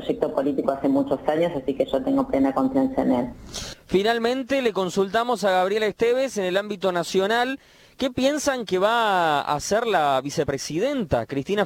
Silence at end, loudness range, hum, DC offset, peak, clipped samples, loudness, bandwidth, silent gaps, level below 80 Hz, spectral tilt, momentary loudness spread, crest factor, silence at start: 0 s; 1 LU; none; under 0.1%; -6 dBFS; under 0.1%; -23 LUFS; 17 kHz; none; -52 dBFS; -4.5 dB/octave; 5 LU; 16 dB; 0 s